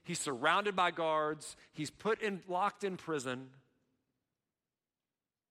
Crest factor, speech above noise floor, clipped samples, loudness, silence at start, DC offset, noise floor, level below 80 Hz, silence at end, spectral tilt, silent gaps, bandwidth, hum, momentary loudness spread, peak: 22 dB; over 54 dB; under 0.1%; -35 LUFS; 0.05 s; under 0.1%; under -90 dBFS; -78 dBFS; 2 s; -3.5 dB/octave; none; 15.5 kHz; none; 13 LU; -16 dBFS